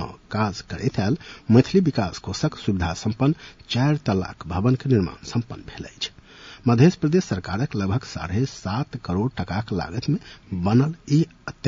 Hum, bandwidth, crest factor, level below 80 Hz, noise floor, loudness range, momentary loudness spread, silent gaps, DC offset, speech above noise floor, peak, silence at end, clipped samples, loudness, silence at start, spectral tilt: none; 7.8 kHz; 20 dB; -48 dBFS; -45 dBFS; 3 LU; 11 LU; none; under 0.1%; 23 dB; -4 dBFS; 0 s; under 0.1%; -23 LUFS; 0 s; -7 dB/octave